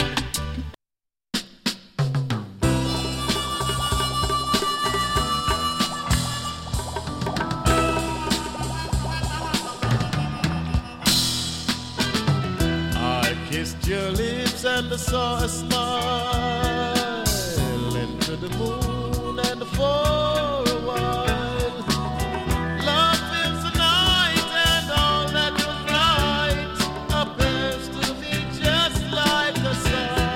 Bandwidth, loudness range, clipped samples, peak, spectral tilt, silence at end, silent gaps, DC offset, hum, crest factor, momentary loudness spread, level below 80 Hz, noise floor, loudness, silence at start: 17 kHz; 5 LU; under 0.1%; -6 dBFS; -4 dB/octave; 0 s; none; under 0.1%; none; 18 dB; 8 LU; -34 dBFS; -88 dBFS; -23 LUFS; 0 s